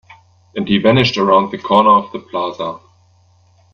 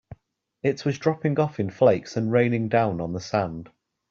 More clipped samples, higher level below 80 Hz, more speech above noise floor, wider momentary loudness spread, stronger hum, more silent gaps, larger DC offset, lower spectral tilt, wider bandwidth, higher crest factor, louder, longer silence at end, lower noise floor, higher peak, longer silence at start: neither; first, -52 dBFS vs -58 dBFS; about the same, 38 dB vs 40 dB; first, 15 LU vs 8 LU; neither; neither; neither; about the same, -6.5 dB/octave vs -7.5 dB/octave; about the same, 7 kHz vs 7.2 kHz; about the same, 16 dB vs 20 dB; first, -14 LUFS vs -24 LUFS; first, 0.95 s vs 0.45 s; second, -52 dBFS vs -63 dBFS; first, 0 dBFS vs -6 dBFS; first, 0.55 s vs 0.1 s